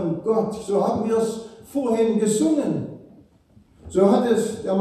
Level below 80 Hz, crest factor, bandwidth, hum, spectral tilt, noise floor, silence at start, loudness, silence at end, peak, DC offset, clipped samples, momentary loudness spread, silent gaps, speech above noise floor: -58 dBFS; 18 dB; 13 kHz; none; -6 dB/octave; -55 dBFS; 0 s; -22 LUFS; 0 s; -4 dBFS; under 0.1%; under 0.1%; 10 LU; none; 34 dB